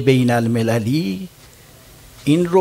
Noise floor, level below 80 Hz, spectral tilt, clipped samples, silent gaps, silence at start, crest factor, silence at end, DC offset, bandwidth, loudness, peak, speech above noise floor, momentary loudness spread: -44 dBFS; -52 dBFS; -7 dB/octave; under 0.1%; none; 0 s; 16 dB; 0 s; under 0.1%; 16 kHz; -18 LUFS; -2 dBFS; 28 dB; 12 LU